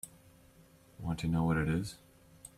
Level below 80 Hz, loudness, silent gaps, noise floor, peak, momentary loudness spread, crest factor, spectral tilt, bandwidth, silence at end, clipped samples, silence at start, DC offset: -54 dBFS; -34 LUFS; none; -61 dBFS; -20 dBFS; 21 LU; 16 dB; -6.5 dB/octave; 15 kHz; 0.1 s; under 0.1%; 0.05 s; under 0.1%